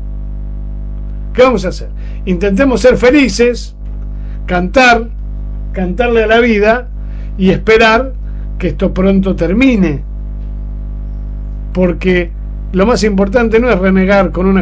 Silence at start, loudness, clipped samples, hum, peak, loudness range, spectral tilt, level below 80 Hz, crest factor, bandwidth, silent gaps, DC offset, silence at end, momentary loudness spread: 0 s; -11 LUFS; 0.3%; 50 Hz at -20 dBFS; 0 dBFS; 3 LU; -6 dB/octave; -20 dBFS; 12 dB; 8 kHz; none; under 0.1%; 0 s; 16 LU